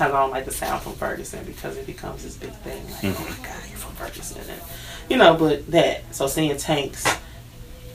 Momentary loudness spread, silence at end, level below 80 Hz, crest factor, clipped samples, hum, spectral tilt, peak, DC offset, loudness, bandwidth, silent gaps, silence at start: 17 LU; 0 s; -42 dBFS; 24 dB; under 0.1%; none; -4 dB/octave; 0 dBFS; under 0.1%; -23 LUFS; 16 kHz; none; 0 s